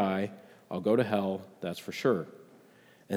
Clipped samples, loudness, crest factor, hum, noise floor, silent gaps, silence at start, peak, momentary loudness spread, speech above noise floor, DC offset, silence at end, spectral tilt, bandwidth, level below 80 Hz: under 0.1%; -31 LUFS; 18 dB; none; -59 dBFS; none; 0 s; -14 dBFS; 12 LU; 28 dB; under 0.1%; 0 s; -6.5 dB/octave; 16.5 kHz; -78 dBFS